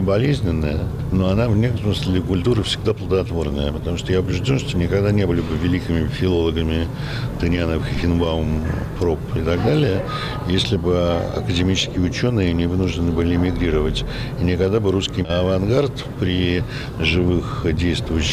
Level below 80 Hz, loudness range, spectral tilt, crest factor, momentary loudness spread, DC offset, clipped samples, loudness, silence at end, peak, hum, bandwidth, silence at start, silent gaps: -30 dBFS; 1 LU; -6.5 dB/octave; 12 dB; 5 LU; under 0.1%; under 0.1%; -20 LUFS; 0 s; -8 dBFS; none; 14.5 kHz; 0 s; none